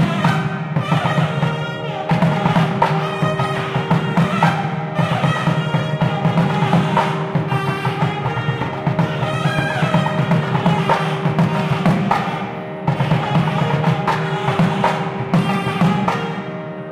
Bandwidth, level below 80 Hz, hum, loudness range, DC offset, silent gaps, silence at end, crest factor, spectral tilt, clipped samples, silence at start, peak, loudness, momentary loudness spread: 12 kHz; -48 dBFS; none; 1 LU; under 0.1%; none; 0 s; 18 dB; -7 dB/octave; under 0.1%; 0 s; 0 dBFS; -18 LUFS; 5 LU